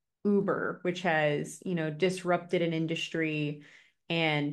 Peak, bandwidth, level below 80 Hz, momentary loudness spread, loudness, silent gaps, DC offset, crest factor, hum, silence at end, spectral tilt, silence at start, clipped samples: -12 dBFS; 12.5 kHz; -76 dBFS; 6 LU; -30 LUFS; none; under 0.1%; 18 dB; none; 0 s; -5.5 dB/octave; 0.25 s; under 0.1%